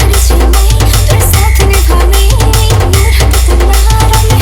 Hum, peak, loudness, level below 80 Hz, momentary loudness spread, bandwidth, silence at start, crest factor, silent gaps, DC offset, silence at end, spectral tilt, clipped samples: none; 0 dBFS; -8 LUFS; -8 dBFS; 1 LU; 18.5 kHz; 0 s; 6 dB; none; under 0.1%; 0 s; -4.5 dB/octave; 0.6%